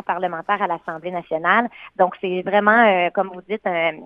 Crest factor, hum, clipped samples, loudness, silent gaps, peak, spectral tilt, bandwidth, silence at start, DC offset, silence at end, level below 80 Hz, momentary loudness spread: 20 dB; none; under 0.1%; -20 LUFS; none; 0 dBFS; -8 dB/octave; 5.2 kHz; 0.1 s; under 0.1%; 0 s; -68 dBFS; 12 LU